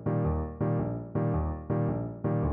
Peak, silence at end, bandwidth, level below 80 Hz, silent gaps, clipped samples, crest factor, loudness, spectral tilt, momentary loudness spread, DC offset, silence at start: -18 dBFS; 0 s; 3 kHz; -40 dBFS; none; under 0.1%; 12 dB; -31 LUFS; -11.5 dB/octave; 3 LU; under 0.1%; 0 s